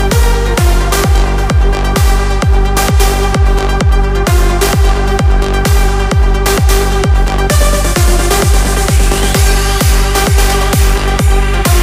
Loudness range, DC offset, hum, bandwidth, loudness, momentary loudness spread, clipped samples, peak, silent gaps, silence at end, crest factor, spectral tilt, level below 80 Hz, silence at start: 1 LU; under 0.1%; none; 16 kHz; -11 LUFS; 2 LU; under 0.1%; 0 dBFS; none; 0 s; 8 dB; -4.5 dB/octave; -10 dBFS; 0 s